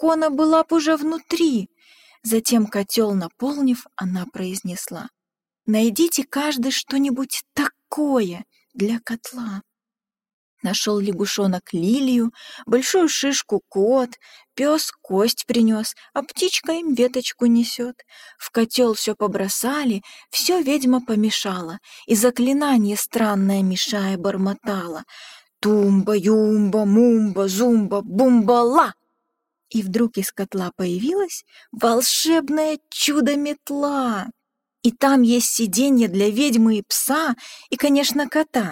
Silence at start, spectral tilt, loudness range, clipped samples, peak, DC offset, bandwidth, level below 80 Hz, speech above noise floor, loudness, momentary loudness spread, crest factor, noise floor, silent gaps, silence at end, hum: 0 s; -4 dB/octave; 5 LU; under 0.1%; -2 dBFS; under 0.1%; 17 kHz; -66 dBFS; over 70 dB; -20 LUFS; 12 LU; 18 dB; under -90 dBFS; 10.33-10.57 s; 0 s; none